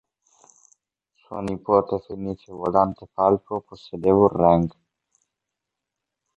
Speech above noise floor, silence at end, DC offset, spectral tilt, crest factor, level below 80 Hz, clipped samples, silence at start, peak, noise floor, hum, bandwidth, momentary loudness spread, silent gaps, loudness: 63 dB; 1.7 s; under 0.1%; -9 dB/octave; 20 dB; -50 dBFS; under 0.1%; 1.3 s; -4 dBFS; -84 dBFS; none; 8 kHz; 15 LU; none; -22 LUFS